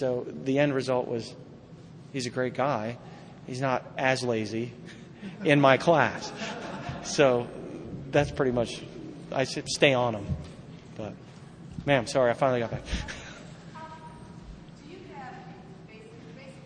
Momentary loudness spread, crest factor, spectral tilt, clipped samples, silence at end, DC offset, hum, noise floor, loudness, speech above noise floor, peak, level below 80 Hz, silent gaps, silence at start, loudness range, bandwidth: 23 LU; 26 dB; -5 dB/octave; under 0.1%; 0 s; under 0.1%; none; -47 dBFS; -27 LUFS; 21 dB; -4 dBFS; -52 dBFS; none; 0 s; 7 LU; 10 kHz